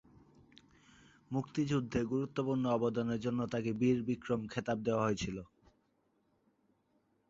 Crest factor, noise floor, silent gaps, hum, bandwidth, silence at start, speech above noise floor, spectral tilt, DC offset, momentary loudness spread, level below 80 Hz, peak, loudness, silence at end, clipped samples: 18 dB; -76 dBFS; none; none; 7.6 kHz; 1.3 s; 42 dB; -6.5 dB/octave; under 0.1%; 6 LU; -62 dBFS; -18 dBFS; -35 LUFS; 1.85 s; under 0.1%